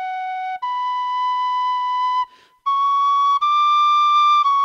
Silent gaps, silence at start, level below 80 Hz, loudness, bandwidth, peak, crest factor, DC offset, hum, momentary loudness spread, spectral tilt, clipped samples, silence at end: none; 0 s; -80 dBFS; -18 LUFS; 7.4 kHz; -10 dBFS; 8 dB; under 0.1%; none; 12 LU; 3 dB/octave; under 0.1%; 0 s